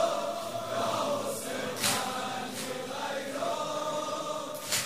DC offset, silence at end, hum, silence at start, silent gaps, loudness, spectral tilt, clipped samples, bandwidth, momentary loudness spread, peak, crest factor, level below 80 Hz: 0.2%; 0 s; none; 0 s; none; -32 LUFS; -2 dB/octave; under 0.1%; 16 kHz; 7 LU; -14 dBFS; 20 dB; -72 dBFS